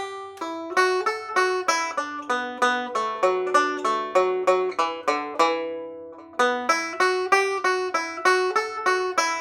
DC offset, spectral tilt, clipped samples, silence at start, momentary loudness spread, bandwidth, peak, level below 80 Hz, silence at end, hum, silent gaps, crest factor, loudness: under 0.1%; -1.5 dB/octave; under 0.1%; 0 s; 9 LU; 16 kHz; -4 dBFS; -78 dBFS; 0 s; none; none; 18 dB; -23 LUFS